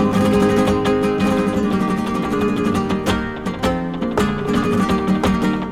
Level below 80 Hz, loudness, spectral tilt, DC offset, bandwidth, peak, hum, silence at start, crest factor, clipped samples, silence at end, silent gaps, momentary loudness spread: -36 dBFS; -18 LUFS; -6.5 dB/octave; under 0.1%; 15 kHz; -4 dBFS; none; 0 s; 14 dB; under 0.1%; 0 s; none; 5 LU